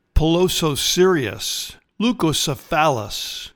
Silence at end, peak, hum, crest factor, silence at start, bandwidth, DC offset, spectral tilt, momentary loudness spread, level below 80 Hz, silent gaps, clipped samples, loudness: 0.1 s; -4 dBFS; none; 16 dB; 0.15 s; 19 kHz; under 0.1%; -4 dB/octave; 10 LU; -32 dBFS; none; under 0.1%; -19 LUFS